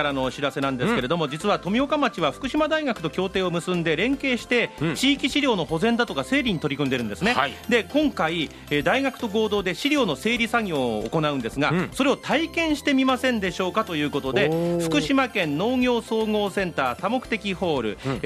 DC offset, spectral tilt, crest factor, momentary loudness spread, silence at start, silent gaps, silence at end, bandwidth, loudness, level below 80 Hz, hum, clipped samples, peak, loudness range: under 0.1%; -5 dB/octave; 18 dB; 4 LU; 0 s; none; 0 s; 15 kHz; -23 LUFS; -48 dBFS; none; under 0.1%; -4 dBFS; 1 LU